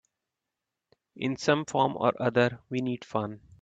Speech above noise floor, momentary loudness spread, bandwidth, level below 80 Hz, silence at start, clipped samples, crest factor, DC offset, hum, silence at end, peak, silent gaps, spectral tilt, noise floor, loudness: 59 dB; 8 LU; 8.8 kHz; -68 dBFS; 1.15 s; under 0.1%; 22 dB; under 0.1%; none; 0.25 s; -8 dBFS; none; -5.5 dB/octave; -87 dBFS; -28 LUFS